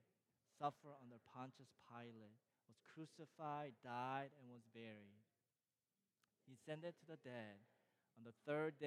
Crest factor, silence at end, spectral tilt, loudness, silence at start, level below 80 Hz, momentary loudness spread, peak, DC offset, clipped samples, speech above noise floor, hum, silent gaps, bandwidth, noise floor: 24 dB; 0 s; -6.5 dB/octave; -54 LUFS; 0.6 s; under -90 dBFS; 17 LU; -32 dBFS; under 0.1%; under 0.1%; over 37 dB; none; none; 13 kHz; under -90 dBFS